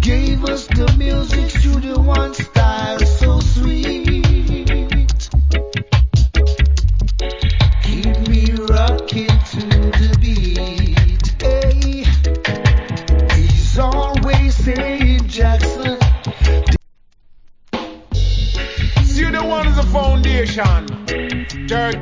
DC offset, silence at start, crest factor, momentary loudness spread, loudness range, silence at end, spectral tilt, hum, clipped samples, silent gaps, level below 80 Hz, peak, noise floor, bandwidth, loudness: under 0.1%; 0 s; 14 dB; 5 LU; 3 LU; 0 s; -6 dB/octave; none; under 0.1%; none; -16 dBFS; 0 dBFS; -46 dBFS; 7.6 kHz; -16 LUFS